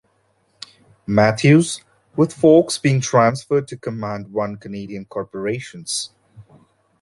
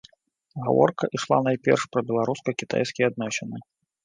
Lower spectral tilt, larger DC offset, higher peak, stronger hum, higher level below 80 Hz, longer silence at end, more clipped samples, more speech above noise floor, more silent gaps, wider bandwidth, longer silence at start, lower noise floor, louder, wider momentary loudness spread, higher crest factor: about the same, -5.5 dB/octave vs -5.5 dB/octave; neither; first, 0 dBFS vs -4 dBFS; neither; first, -56 dBFS vs -68 dBFS; first, 0.6 s vs 0.45 s; neither; first, 45 dB vs 41 dB; neither; first, 11.5 kHz vs 9.8 kHz; first, 1.1 s vs 0.55 s; about the same, -63 dBFS vs -65 dBFS; first, -18 LUFS vs -24 LUFS; first, 18 LU vs 11 LU; about the same, 18 dB vs 20 dB